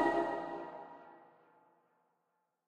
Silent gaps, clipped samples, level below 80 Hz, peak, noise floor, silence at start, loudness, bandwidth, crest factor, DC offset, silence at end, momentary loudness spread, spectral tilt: none; under 0.1%; -76 dBFS; -18 dBFS; -83 dBFS; 0 s; -39 LUFS; 10 kHz; 22 dB; under 0.1%; 1.45 s; 24 LU; -6 dB/octave